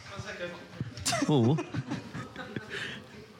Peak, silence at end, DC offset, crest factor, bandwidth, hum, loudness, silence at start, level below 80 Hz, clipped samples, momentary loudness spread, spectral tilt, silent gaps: -14 dBFS; 0 s; under 0.1%; 18 dB; 17 kHz; none; -32 LUFS; 0 s; -62 dBFS; under 0.1%; 15 LU; -5 dB/octave; none